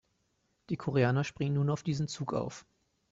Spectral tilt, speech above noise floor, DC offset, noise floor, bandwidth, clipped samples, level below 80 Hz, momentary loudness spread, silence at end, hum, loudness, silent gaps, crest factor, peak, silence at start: -6.5 dB/octave; 45 dB; under 0.1%; -76 dBFS; 7.8 kHz; under 0.1%; -64 dBFS; 11 LU; 0.5 s; none; -32 LUFS; none; 18 dB; -14 dBFS; 0.7 s